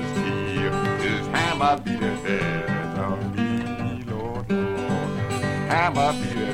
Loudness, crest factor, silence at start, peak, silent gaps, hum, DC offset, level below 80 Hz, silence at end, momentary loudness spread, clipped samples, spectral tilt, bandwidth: -24 LUFS; 18 dB; 0 s; -6 dBFS; none; none; under 0.1%; -46 dBFS; 0 s; 6 LU; under 0.1%; -6 dB/octave; 16 kHz